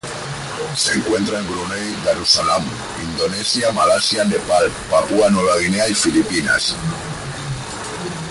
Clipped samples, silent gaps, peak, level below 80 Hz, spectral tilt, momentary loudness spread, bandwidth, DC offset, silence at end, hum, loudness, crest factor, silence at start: under 0.1%; none; -2 dBFS; -44 dBFS; -3.5 dB/octave; 12 LU; 11.5 kHz; under 0.1%; 0 s; none; -18 LUFS; 16 dB; 0.05 s